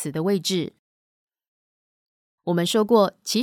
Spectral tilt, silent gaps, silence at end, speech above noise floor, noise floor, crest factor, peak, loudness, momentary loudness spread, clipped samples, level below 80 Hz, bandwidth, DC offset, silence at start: -5 dB/octave; 0.79-1.28 s, 1.47-2.38 s; 0 s; over 68 dB; under -90 dBFS; 18 dB; -6 dBFS; -22 LUFS; 12 LU; under 0.1%; -72 dBFS; 18 kHz; under 0.1%; 0 s